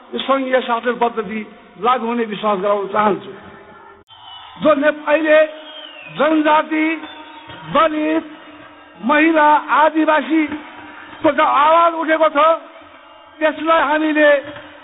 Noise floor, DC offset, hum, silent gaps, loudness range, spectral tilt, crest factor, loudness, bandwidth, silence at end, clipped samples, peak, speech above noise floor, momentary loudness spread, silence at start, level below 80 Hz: -42 dBFS; under 0.1%; none; 4.03-4.07 s; 5 LU; -2 dB/octave; 16 dB; -16 LUFS; 4 kHz; 0.15 s; under 0.1%; -2 dBFS; 27 dB; 21 LU; 0.1 s; -60 dBFS